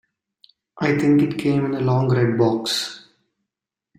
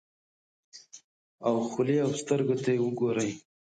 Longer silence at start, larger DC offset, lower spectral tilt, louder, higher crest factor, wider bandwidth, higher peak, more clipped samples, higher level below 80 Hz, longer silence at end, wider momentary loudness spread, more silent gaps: about the same, 0.75 s vs 0.75 s; neither; about the same, -6 dB/octave vs -6 dB/octave; first, -20 LUFS vs -29 LUFS; about the same, 16 dB vs 16 dB; first, 14.5 kHz vs 9.4 kHz; first, -6 dBFS vs -14 dBFS; neither; first, -58 dBFS vs -74 dBFS; first, 1 s vs 0.3 s; about the same, 7 LU vs 7 LU; second, none vs 1.04-1.38 s